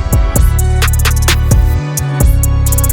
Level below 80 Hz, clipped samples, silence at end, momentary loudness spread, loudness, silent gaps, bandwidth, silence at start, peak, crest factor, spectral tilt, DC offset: -12 dBFS; under 0.1%; 0 s; 2 LU; -12 LUFS; none; 19 kHz; 0 s; 0 dBFS; 10 dB; -4.5 dB/octave; under 0.1%